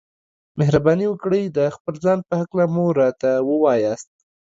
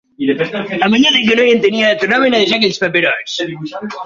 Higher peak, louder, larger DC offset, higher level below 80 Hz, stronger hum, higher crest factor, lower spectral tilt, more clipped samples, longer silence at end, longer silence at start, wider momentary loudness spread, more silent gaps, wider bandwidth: about the same, -2 dBFS vs 0 dBFS; second, -19 LUFS vs -13 LUFS; neither; about the same, -52 dBFS vs -56 dBFS; neither; about the same, 16 dB vs 14 dB; first, -8 dB/octave vs -4 dB/octave; neither; first, 0.5 s vs 0 s; first, 0.55 s vs 0.2 s; second, 6 LU vs 11 LU; first, 1.80-1.85 s vs none; about the same, 7.8 kHz vs 7.6 kHz